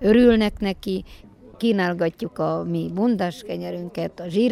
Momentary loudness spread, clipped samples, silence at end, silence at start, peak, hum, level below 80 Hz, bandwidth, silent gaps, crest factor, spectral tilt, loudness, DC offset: 13 LU; under 0.1%; 0 s; 0 s; -4 dBFS; none; -44 dBFS; 13.5 kHz; none; 18 dB; -7 dB/octave; -23 LUFS; under 0.1%